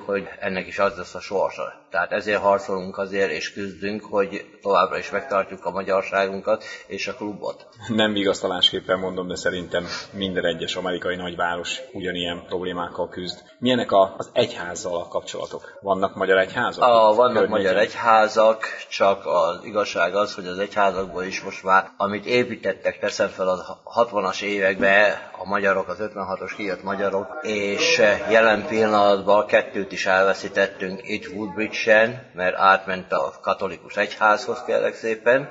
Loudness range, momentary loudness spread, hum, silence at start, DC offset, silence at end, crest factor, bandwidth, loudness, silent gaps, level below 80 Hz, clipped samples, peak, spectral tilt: 6 LU; 12 LU; none; 0 s; under 0.1%; 0 s; 20 dB; 8 kHz; -22 LUFS; none; -60 dBFS; under 0.1%; -2 dBFS; -4 dB/octave